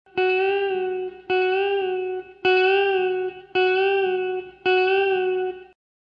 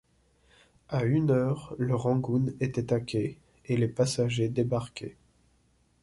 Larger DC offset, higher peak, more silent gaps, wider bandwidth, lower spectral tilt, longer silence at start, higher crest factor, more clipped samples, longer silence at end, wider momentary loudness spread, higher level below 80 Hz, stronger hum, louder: neither; about the same, -10 dBFS vs -12 dBFS; neither; second, 5.4 kHz vs 11.5 kHz; about the same, -6 dB/octave vs -7 dB/octave; second, 0.15 s vs 0.9 s; about the same, 14 dB vs 16 dB; neither; second, 0.45 s vs 0.9 s; about the same, 9 LU vs 9 LU; second, -64 dBFS vs -58 dBFS; neither; first, -22 LUFS vs -29 LUFS